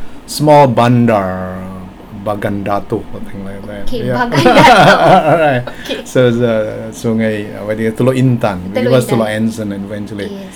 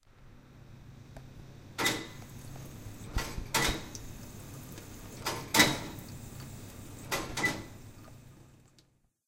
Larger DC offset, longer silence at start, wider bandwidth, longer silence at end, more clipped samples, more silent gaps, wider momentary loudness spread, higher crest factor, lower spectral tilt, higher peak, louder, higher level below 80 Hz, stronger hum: neither; about the same, 0 s vs 0.05 s; first, 19.5 kHz vs 17 kHz; second, 0 s vs 0.7 s; first, 0.8% vs under 0.1%; neither; second, 18 LU vs 23 LU; second, 12 dB vs 30 dB; first, -6 dB/octave vs -2.5 dB/octave; first, 0 dBFS vs -8 dBFS; first, -12 LUFS vs -31 LUFS; first, -34 dBFS vs -50 dBFS; neither